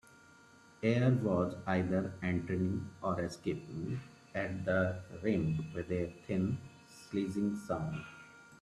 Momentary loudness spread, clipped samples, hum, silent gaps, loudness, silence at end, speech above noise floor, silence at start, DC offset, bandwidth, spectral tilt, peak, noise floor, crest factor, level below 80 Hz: 12 LU; under 0.1%; none; none; -36 LUFS; 0.05 s; 26 dB; 0.8 s; under 0.1%; 12 kHz; -8 dB/octave; -16 dBFS; -60 dBFS; 20 dB; -64 dBFS